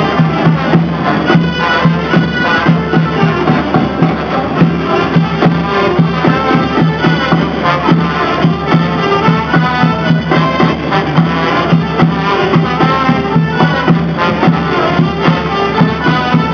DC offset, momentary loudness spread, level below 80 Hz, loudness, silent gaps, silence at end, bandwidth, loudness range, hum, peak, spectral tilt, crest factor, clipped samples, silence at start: 0.2%; 2 LU; -34 dBFS; -11 LUFS; none; 0 s; 5.4 kHz; 1 LU; none; 0 dBFS; -7.5 dB/octave; 10 dB; under 0.1%; 0 s